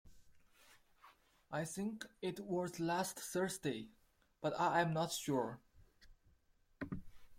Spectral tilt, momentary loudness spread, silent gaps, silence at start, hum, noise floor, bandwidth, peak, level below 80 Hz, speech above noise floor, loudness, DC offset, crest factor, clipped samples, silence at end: -4.5 dB/octave; 13 LU; none; 0.05 s; none; -73 dBFS; 16.5 kHz; -22 dBFS; -68 dBFS; 33 dB; -40 LUFS; under 0.1%; 22 dB; under 0.1%; 0 s